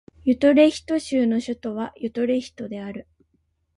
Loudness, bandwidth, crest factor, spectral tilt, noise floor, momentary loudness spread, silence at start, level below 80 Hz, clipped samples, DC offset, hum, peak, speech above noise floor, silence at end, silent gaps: -22 LUFS; 11 kHz; 18 dB; -5.5 dB/octave; -69 dBFS; 17 LU; 0.25 s; -56 dBFS; under 0.1%; under 0.1%; none; -4 dBFS; 47 dB; 0.75 s; none